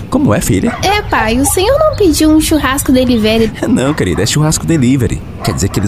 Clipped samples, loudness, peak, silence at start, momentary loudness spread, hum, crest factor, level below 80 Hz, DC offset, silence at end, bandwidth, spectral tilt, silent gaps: under 0.1%; -11 LUFS; 0 dBFS; 0 s; 4 LU; none; 10 dB; -26 dBFS; 0.8%; 0 s; 16 kHz; -5 dB/octave; none